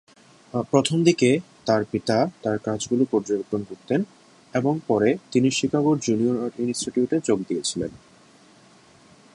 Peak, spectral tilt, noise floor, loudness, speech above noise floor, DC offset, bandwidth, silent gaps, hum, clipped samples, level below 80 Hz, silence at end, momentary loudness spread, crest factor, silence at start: -4 dBFS; -5.5 dB/octave; -53 dBFS; -23 LUFS; 31 dB; under 0.1%; 11.5 kHz; none; none; under 0.1%; -60 dBFS; 1.45 s; 8 LU; 20 dB; 0.55 s